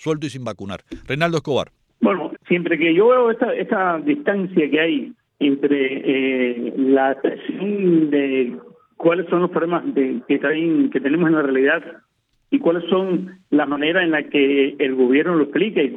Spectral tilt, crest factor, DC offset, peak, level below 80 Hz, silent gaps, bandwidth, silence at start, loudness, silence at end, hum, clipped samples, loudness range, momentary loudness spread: -7 dB/octave; 16 dB; under 0.1%; -4 dBFS; -60 dBFS; none; 9.2 kHz; 0 s; -19 LUFS; 0 s; none; under 0.1%; 2 LU; 9 LU